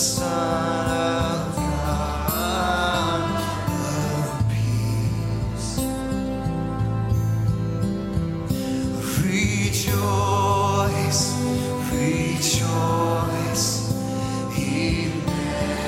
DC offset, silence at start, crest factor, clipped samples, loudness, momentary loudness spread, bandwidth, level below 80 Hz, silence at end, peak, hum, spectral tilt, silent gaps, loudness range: under 0.1%; 0 s; 16 dB; under 0.1%; -23 LUFS; 5 LU; 16.5 kHz; -36 dBFS; 0 s; -8 dBFS; none; -5 dB/octave; none; 3 LU